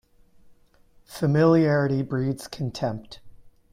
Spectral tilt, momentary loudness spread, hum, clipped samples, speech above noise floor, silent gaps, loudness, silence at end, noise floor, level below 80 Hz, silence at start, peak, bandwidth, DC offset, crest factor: -7.5 dB/octave; 13 LU; none; under 0.1%; 34 dB; none; -23 LUFS; 0.4 s; -57 dBFS; -56 dBFS; 1.1 s; -8 dBFS; 15.5 kHz; under 0.1%; 18 dB